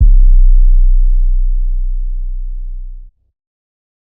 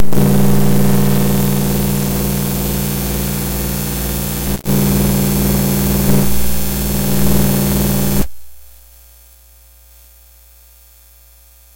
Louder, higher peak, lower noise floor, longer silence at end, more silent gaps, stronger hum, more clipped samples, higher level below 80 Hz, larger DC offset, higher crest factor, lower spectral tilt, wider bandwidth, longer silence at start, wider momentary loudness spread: about the same, -16 LUFS vs -15 LUFS; about the same, 0 dBFS vs 0 dBFS; second, -29 dBFS vs -44 dBFS; first, 1.05 s vs 0 s; neither; second, none vs 60 Hz at -25 dBFS; neither; first, -10 dBFS vs -26 dBFS; neither; about the same, 10 dB vs 14 dB; first, -16.5 dB/octave vs -5.5 dB/octave; second, 0.2 kHz vs 16.5 kHz; about the same, 0 s vs 0 s; first, 17 LU vs 5 LU